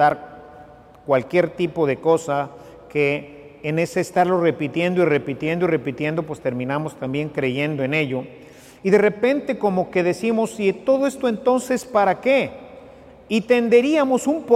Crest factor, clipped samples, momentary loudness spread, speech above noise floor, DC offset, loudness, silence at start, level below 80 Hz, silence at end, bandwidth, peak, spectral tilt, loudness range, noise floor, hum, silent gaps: 16 dB; under 0.1%; 9 LU; 25 dB; under 0.1%; -21 LUFS; 0 s; -58 dBFS; 0 s; 14.5 kHz; -4 dBFS; -6 dB/octave; 3 LU; -45 dBFS; none; none